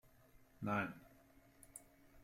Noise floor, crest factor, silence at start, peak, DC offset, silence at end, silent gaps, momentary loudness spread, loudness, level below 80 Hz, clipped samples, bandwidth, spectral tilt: -67 dBFS; 22 dB; 0.35 s; -26 dBFS; under 0.1%; 0 s; none; 23 LU; -43 LUFS; -72 dBFS; under 0.1%; 16 kHz; -6 dB/octave